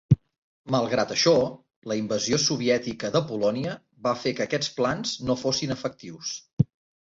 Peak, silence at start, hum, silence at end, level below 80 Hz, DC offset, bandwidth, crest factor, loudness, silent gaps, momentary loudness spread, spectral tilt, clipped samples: -6 dBFS; 0.1 s; none; 0.4 s; -54 dBFS; under 0.1%; 7.8 kHz; 20 dB; -26 LUFS; 0.38-0.64 s, 1.76-1.82 s, 6.53-6.57 s; 11 LU; -4.5 dB/octave; under 0.1%